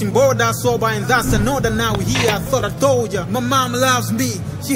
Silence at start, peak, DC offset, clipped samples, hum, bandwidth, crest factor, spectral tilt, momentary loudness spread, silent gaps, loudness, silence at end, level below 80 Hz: 0 s; -2 dBFS; under 0.1%; under 0.1%; none; 16.5 kHz; 16 dB; -4.5 dB/octave; 5 LU; none; -17 LUFS; 0 s; -34 dBFS